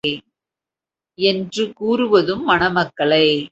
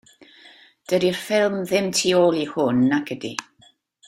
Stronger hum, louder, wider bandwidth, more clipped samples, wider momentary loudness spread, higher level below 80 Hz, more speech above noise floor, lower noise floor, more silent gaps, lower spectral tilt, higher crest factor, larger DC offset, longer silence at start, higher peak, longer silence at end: neither; first, -17 LUFS vs -21 LUFS; second, 8.2 kHz vs 16 kHz; neither; second, 8 LU vs 11 LU; first, -52 dBFS vs -62 dBFS; first, 72 dB vs 37 dB; first, -89 dBFS vs -57 dBFS; neither; about the same, -5 dB/octave vs -4.5 dB/octave; about the same, 18 dB vs 18 dB; neither; second, 0.05 s vs 0.9 s; about the same, -2 dBFS vs -4 dBFS; second, 0.05 s vs 0.65 s